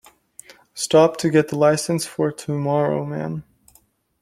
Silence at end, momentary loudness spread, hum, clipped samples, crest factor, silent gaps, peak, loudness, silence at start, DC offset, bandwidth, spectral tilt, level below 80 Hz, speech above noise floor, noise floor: 0.8 s; 13 LU; none; under 0.1%; 18 dB; none; -2 dBFS; -20 LUFS; 0.75 s; under 0.1%; 15 kHz; -5.5 dB/octave; -60 dBFS; 39 dB; -59 dBFS